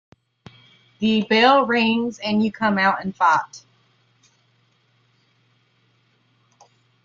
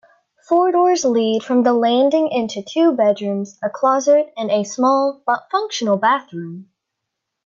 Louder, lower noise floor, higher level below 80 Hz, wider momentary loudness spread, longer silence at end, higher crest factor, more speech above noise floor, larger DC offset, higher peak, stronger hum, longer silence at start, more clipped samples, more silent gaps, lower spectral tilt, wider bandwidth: about the same, -19 LUFS vs -17 LUFS; second, -63 dBFS vs -79 dBFS; about the same, -66 dBFS vs -70 dBFS; about the same, 8 LU vs 9 LU; first, 3.45 s vs 0.85 s; first, 20 dB vs 12 dB; second, 44 dB vs 62 dB; neither; about the same, -4 dBFS vs -4 dBFS; neither; first, 1 s vs 0.5 s; neither; neither; about the same, -5 dB/octave vs -4.5 dB/octave; about the same, 7.4 kHz vs 7.6 kHz